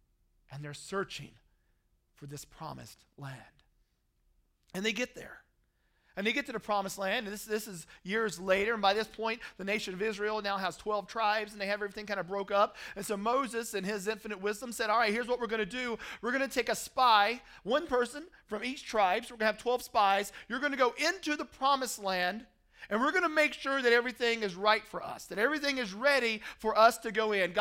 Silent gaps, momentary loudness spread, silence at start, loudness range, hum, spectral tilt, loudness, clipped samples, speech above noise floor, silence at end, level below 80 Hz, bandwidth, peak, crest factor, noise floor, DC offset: none; 17 LU; 0.5 s; 12 LU; none; -3 dB/octave; -31 LUFS; under 0.1%; 42 dB; 0 s; -64 dBFS; 16 kHz; -10 dBFS; 22 dB; -73 dBFS; under 0.1%